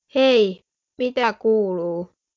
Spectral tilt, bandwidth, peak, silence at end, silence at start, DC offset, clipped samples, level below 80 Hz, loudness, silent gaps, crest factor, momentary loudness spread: -5.5 dB/octave; 7.4 kHz; -6 dBFS; 0.3 s; 0.15 s; under 0.1%; under 0.1%; -68 dBFS; -20 LUFS; none; 14 dB; 12 LU